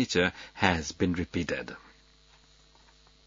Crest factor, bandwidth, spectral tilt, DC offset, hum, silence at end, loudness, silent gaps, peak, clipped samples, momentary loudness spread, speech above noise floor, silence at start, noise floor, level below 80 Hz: 26 dB; 7.6 kHz; -4.5 dB/octave; under 0.1%; none; 1.5 s; -29 LUFS; none; -6 dBFS; under 0.1%; 11 LU; 30 dB; 0 s; -60 dBFS; -56 dBFS